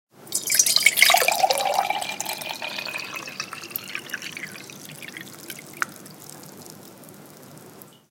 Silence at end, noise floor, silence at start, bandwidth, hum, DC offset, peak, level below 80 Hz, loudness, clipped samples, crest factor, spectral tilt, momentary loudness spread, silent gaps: 0.2 s; -47 dBFS; 0.2 s; 17 kHz; none; under 0.1%; 0 dBFS; -76 dBFS; -22 LUFS; under 0.1%; 26 dB; 0.5 dB/octave; 25 LU; none